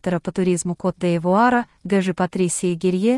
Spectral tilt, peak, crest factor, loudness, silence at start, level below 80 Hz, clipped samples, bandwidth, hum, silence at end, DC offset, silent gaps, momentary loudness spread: -5.5 dB/octave; -4 dBFS; 14 dB; -20 LUFS; 0.05 s; -54 dBFS; under 0.1%; 12 kHz; none; 0 s; under 0.1%; none; 6 LU